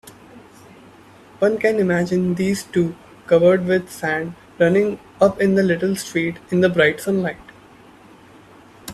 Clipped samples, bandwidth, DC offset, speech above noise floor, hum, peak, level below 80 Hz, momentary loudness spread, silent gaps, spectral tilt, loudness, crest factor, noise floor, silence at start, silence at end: under 0.1%; 14 kHz; under 0.1%; 28 dB; none; -2 dBFS; -56 dBFS; 9 LU; none; -6 dB/octave; -19 LUFS; 18 dB; -46 dBFS; 0.05 s; 0 s